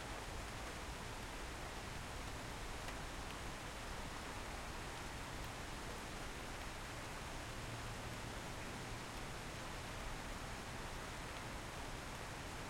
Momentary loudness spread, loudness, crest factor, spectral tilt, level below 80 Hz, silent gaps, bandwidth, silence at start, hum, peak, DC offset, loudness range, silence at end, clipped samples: 1 LU; -48 LUFS; 16 dB; -3.5 dB/octave; -54 dBFS; none; 16.5 kHz; 0 s; none; -32 dBFS; under 0.1%; 0 LU; 0 s; under 0.1%